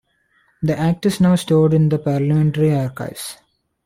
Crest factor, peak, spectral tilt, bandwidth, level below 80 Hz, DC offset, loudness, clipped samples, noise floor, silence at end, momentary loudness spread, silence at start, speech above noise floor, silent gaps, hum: 12 dB; -6 dBFS; -7.5 dB/octave; 15.5 kHz; -48 dBFS; under 0.1%; -17 LUFS; under 0.1%; -61 dBFS; 0.5 s; 13 LU; 0.6 s; 44 dB; none; none